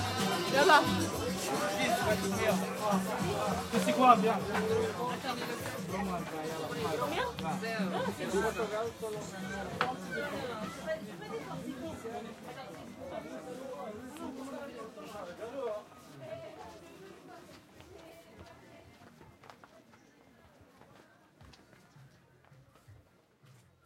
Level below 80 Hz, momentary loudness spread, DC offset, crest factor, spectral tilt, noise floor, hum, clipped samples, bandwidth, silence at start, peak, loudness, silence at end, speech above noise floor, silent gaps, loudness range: -64 dBFS; 23 LU; under 0.1%; 26 dB; -4.5 dB/octave; -64 dBFS; none; under 0.1%; 16.5 kHz; 0 s; -8 dBFS; -33 LUFS; 0.35 s; 31 dB; none; 20 LU